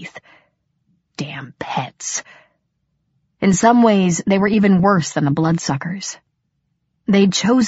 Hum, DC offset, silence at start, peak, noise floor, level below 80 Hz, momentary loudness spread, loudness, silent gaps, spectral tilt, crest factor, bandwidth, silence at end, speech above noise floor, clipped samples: none; under 0.1%; 0 s; -2 dBFS; -70 dBFS; -52 dBFS; 16 LU; -17 LUFS; none; -5.5 dB/octave; 16 dB; 8 kHz; 0 s; 54 dB; under 0.1%